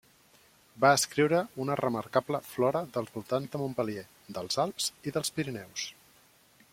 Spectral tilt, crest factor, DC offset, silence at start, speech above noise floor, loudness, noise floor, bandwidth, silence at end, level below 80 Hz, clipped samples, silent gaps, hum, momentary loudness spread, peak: -4 dB/octave; 22 dB; under 0.1%; 0.75 s; 32 dB; -30 LUFS; -62 dBFS; 16.5 kHz; 0.8 s; -70 dBFS; under 0.1%; none; none; 12 LU; -8 dBFS